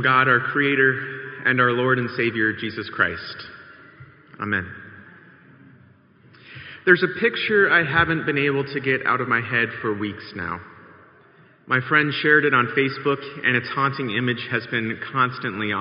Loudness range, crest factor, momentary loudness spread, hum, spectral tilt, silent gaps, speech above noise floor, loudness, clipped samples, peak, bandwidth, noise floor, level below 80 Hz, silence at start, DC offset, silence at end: 9 LU; 22 dB; 14 LU; none; -3 dB/octave; none; 31 dB; -21 LUFS; under 0.1%; 0 dBFS; 5.4 kHz; -53 dBFS; -58 dBFS; 0 s; under 0.1%; 0 s